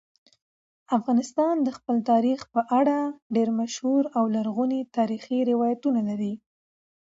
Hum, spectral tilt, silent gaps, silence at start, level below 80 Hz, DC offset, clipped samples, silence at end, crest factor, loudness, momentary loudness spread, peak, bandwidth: none; -6 dB/octave; 3.22-3.30 s; 0.9 s; -74 dBFS; under 0.1%; under 0.1%; 0.7 s; 16 dB; -25 LUFS; 5 LU; -10 dBFS; 7.8 kHz